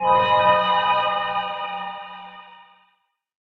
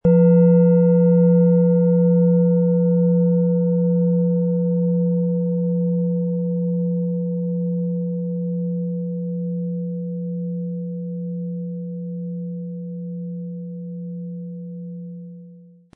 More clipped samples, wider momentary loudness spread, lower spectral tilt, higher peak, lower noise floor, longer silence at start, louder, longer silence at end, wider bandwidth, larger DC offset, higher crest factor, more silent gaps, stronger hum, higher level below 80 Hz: neither; first, 20 LU vs 17 LU; second, -5.5 dB/octave vs -16 dB/octave; about the same, -4 dBFS vs -6 dBFS; first, -68 dBFS vs -45 dBFS; about the same, 0 s vs 0.05 s; about the same, -20 LUFS vs -20 LUFS; first, 0.95 s vs 0.35 s; first, 6 kHz vs 2.1 kHz; neither; about the same, 18 dB vs 14 dB; neither; neither; about the same, -58 dBFS vs -60 dBFS